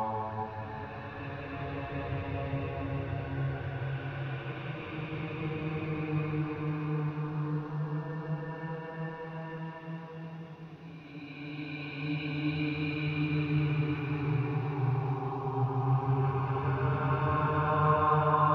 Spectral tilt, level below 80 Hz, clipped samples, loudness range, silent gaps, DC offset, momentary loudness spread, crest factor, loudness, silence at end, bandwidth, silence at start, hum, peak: -9.5 dB/octave; -56 dBFS; under 0.1%; 9 LU; none; under 0.1%; 12 LU; 18 dB; -33 LUFS; 0 s; 5.4 kHz; 0 s; none; -14 dBFS